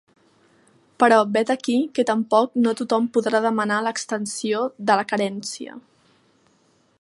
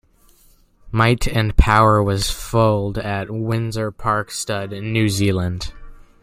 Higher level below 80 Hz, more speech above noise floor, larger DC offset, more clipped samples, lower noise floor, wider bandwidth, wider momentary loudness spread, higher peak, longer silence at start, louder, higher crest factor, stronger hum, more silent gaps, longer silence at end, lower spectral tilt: second, -76 dBFS vs -28 dBFS; first, 41 dB vs 35 dB; neither; neither; first, -61 dBFS vs -53 dBFS; second, 11.5 kHz vs 16 kHz; about the same, 9 LU vs 10 LU; about the same, -2 dBFS vs 0 dBFS; first, 1 s vs 0.85 s; about the same, -21 LUFS vs -19 LUFS; about the same, 20 dB vs 18 dB; neither; neither; first, 1.2 s vs 0.3 s; second, -4 dB/octave vs -5.5 dB/octave